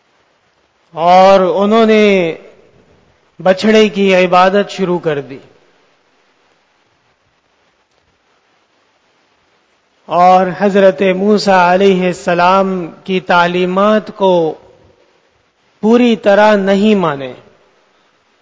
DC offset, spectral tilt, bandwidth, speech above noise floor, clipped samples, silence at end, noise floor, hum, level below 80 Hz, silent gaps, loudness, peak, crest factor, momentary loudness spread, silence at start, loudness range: under 0.1%; -6 dB/octave; 8 kHz; 47 dB; 0.3%; 1.05 s; -57 dBFS; none; -54 dBFS; none; -11 LUFS; 0 dBFS; 12 dB; 11 LU; 0.95 s; 6 LU